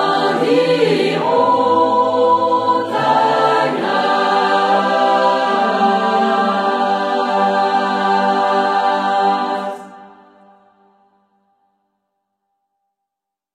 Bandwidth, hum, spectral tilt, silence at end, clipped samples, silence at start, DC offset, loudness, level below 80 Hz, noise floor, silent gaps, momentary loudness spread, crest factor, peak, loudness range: 12 kHz; none; -5 dB/octave; 3.45 s; under 0.1%; 0 s; under 0.1%; -15 LUFS; -68 dBFS; -82 dBFS; none; 3 LU; 14 dB; -2 dBFS; 7 LU